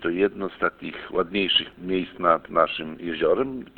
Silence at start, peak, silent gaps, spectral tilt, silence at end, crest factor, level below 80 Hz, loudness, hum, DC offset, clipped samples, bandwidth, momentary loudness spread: 0 s; -4 dBFS; none; -7.5 dB/octave; 0.1 s; 20 dB; -56 dBFS; -24 LUFS; none; under 0.1%; under 0.1%; 4.5 kHz; 8 LU